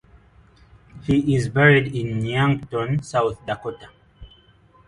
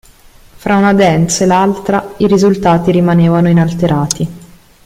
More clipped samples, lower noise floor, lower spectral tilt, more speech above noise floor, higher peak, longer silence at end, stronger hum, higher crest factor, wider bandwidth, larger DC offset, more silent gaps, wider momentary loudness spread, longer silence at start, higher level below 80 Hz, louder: neither; first, -54 dBFS vs -41 dBFS; about the same, -7 dB/octave vs -6 dB/octave; about the same, 34 dB vs 31 dB; about the same, -2 dBFS vs 0 dBFS; first, 0.6 s vs 0.45 s; neither; first, 20 dB vs 12 dB; second, 11 kHz vs 15 kHz; neither; neither; first, 15 LU vs 7 LU; first, 0.95 s vs 0.65 s; second, -48 dBFS vs -40 dBFS; second, -21 LUFS vs -11 LUFS